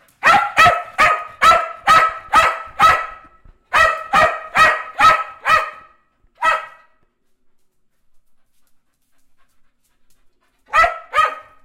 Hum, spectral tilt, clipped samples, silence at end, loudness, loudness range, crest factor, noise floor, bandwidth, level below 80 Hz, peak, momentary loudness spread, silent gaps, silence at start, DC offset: none; -2 dB/octave; under 0.1%; 0.25 s; -14 LUFS; 13 LU; 16 dB; -59 dBFS; 16 kHz; -46 dBFS; -2 dBFS; 6 LU; none; 0.25 s; under 0.1%